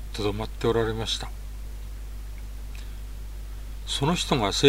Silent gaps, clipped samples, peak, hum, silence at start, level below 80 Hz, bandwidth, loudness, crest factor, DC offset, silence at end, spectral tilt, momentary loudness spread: none; under 0.1%; -4 dBFS; 50 Hz at -35 dBFS; 0 s; -36 dBFS; 16 kHz; -28 LUFS; 24 dB; under 0.1%; 0 s; -4.5 dB/octave; 16 LU